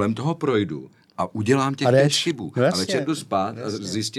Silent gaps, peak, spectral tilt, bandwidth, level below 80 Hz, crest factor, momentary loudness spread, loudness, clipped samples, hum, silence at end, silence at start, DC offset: none; -6 dBFS; -5 dB/octave; 14 kHz; -70 dBFS; 16 dB; 12 LU; -22 LUFS; under 0.1%; none; 0 s; 0 s; under 0.1%